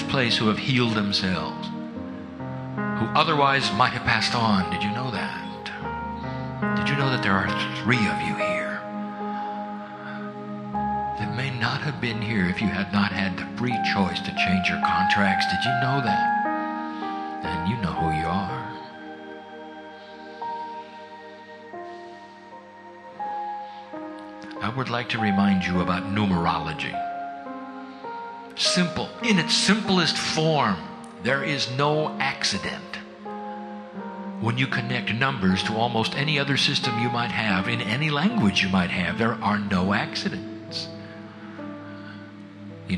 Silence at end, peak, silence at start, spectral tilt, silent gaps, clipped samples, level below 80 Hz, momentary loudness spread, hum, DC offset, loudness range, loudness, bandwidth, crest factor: 0 s; -2 dBFS; 0 s; -5 dB/octave; none; under 0.1%; -54 dBFS; 18 LU; none; under 0.1%; 10 LU; -24 LUFS; 11 kHz; 22 dB